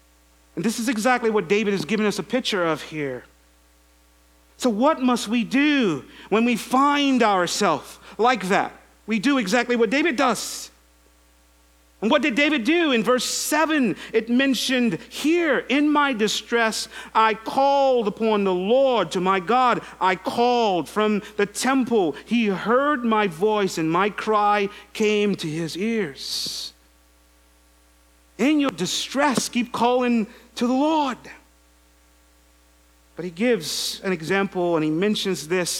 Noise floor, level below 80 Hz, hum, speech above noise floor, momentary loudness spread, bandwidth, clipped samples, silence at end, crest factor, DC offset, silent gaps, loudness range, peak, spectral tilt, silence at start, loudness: -56 dBFS; -58 dBFS; none; 35 dB; 8 LU; 16.5 kHz; under 0.1%; 0 s; 18 dB; under 0.1%; none; 6 LU; -4 dBFS; -4 dB/octave; 0.55 s; -21 LUFS